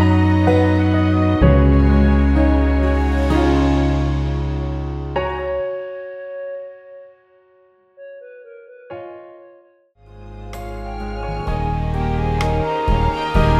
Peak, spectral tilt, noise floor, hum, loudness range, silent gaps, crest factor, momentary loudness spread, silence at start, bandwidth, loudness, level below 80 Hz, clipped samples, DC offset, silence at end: -2 dBFS; -8.5 dB/octave; -54 dBFS; none; 23 LU; none; 16 dB; 21 LU; 0 s; 8.2 kHz; -18 LUFS; -22 dBFS; under 0.1%; under 0.1%; 0 s